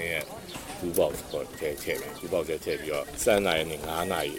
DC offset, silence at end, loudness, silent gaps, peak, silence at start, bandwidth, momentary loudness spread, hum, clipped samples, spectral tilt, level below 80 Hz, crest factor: under 0.1%; 0 s; -30 LUFS; none; -10 dBFS; 0 s; 16.5 kHz; 11 LU; none; under 0.1%; -3.5 dB/octave; -50 dBFS; 20 dB